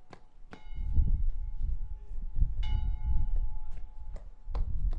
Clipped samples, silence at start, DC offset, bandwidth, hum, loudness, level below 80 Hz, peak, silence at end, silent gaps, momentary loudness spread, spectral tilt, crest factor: under 0.1%; 0 s; under 0.1%; 3.9 kHz; none; -37 LUFS; -32 dBFS; -12 dBFS; 0 s; none; 16 LU; -8 dB/octave; 16 dB